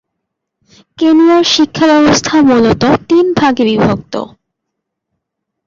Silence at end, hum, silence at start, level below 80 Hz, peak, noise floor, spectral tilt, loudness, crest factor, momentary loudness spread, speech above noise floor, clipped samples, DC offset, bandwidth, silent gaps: 1.4 s; none; 1 s; -42 dBFS; 0 dBFS; -74 dBFS; -4.5 dB/octave; -9 LUFS; 10 dB; 9 LU; 65 dB; under 0.1%; under 0.1%; 7.6 kHz; none